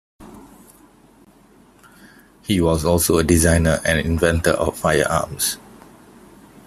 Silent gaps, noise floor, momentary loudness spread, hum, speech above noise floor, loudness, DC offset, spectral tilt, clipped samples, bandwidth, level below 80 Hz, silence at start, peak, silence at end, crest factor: none; -51 dBFS; 7 LU; none; 33 dB; -18 LUFS; under 0.1%; -4.5 dB/octave; under 0.1%; 15.5 kHz; -38 dBFS; 0.2 s; -2 dBFS; 1.1 s; 20 dB